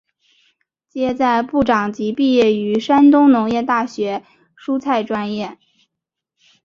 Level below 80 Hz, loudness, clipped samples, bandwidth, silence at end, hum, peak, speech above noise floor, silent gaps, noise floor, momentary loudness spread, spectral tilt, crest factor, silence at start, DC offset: -54 dBFS; -16 LUFS; under 0.1%; 7.2 kHz; 1.1 s; none; -2 dBFS; 66 dB; none; -82 dBFS; 14 LU; -6 dB/octave; 16 dB; 0.95 s; under 0.1%